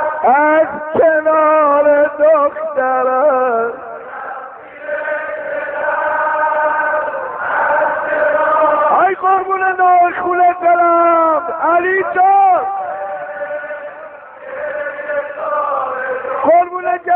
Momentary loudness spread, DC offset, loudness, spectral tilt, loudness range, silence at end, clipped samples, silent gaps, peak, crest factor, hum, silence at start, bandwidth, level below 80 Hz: 14 LU; under 0.1%; -14 LUFS; -3 dB/octave; 7 LU; 0 s; under 0.1%; none; -2 dBFS; 12 dB; none; 0 s; 3.7 kHz; -58 dBFS